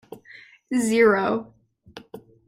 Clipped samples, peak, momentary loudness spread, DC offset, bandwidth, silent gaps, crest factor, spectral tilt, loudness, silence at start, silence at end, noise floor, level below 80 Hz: under 0.1%; -6 dBFS; 25 LU; under 0.1%; 15.5 kHz; none; 18 dB; -4.5 dB/octave; -21 LUFS; 0.1 s; 0.3 s; -49 dBFS; -64 dBFS